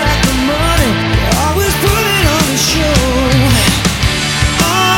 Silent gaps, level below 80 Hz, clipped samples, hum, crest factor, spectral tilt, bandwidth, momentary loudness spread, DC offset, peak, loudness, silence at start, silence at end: none; -20 dBFS; under 0.1%; none; 12 dB; -4 dB/octave; 17 kHz; 3 LU; under 0.1%; 0 dBFS; -11 LUFS; 0 s; 0 s